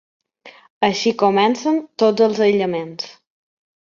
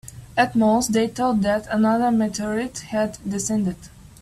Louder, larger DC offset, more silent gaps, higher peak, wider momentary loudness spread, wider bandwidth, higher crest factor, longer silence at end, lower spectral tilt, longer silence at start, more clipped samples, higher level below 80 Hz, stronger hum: first, -17 LUFS vs -22 LUFS; neither; first, 0.70-0.81 s vs none; about the same, -2 dBFS vs -4 dBFS; first, 12 LU vs 8 LU; second, 7.4 kHz vs 14 kHz; about the same, 18 dB vs 18 dB; first, 0.7 s vs 0.15 s; about the same, -5 dB/octave vs -5 dB/octave; first, 0.45 s vs 0.05 s; neither; second, -66 dBFS vs -50 dBFS; neither